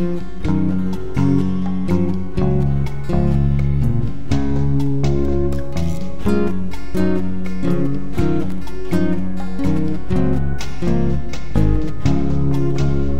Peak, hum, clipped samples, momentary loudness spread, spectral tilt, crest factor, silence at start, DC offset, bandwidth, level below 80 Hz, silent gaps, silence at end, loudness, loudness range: -2 dBFS; none; under 0.1%; 6 LU; -8.5 dB/octave; 16 dB; 0 s; 20%; 11.5 kHz; -26 dBFS; none; 0 s; -20 LUFS; 3 LU